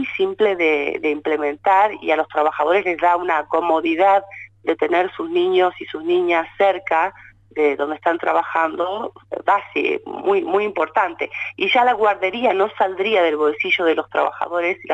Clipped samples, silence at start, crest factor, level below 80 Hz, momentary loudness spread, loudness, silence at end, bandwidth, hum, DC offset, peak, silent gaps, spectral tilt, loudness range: under 0.1%; 0 s; 14 dB; -62 dBFS; 6 LU; -19 LUFS; 0 s; 8 kHz; none; under 0.1%; -6 dBFS; none; -5 dB/octave; 3 LU